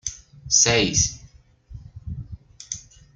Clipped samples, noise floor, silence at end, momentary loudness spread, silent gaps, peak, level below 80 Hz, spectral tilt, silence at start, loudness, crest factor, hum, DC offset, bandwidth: under 0.1%; -49 dBFS; 0.35 s; 26 LU; none; -2 dBFS; -44 dBFS; -2 dB/octave; 0.05 s; -18 LUFS; 24 dB; none; under 0.1%; 11 kHz